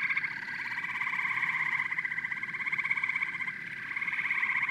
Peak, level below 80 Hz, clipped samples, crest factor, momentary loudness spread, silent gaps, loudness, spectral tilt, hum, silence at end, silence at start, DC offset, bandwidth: -16 dBFS; -80 dBFS; under 0.1%; 16 dB; 6 LU; none; -30 LUFS; -2.5 dB/octave; none; 0 s; 0 s; under 0.1%; 14 kHz